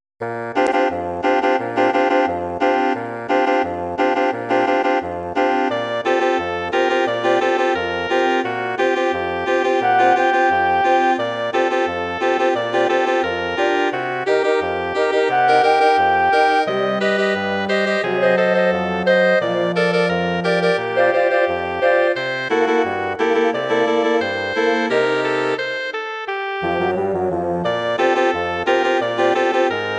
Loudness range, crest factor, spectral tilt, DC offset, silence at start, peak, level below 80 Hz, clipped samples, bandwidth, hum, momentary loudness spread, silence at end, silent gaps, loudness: 3 LU; 14 dB; -5 dB/octave; under 0.1%; 0.2 s; -4 dBFS; -56 dBFS; under 0.1%; 9.6 kHz; none; 6 LU; 0 s; none; -18 LUFS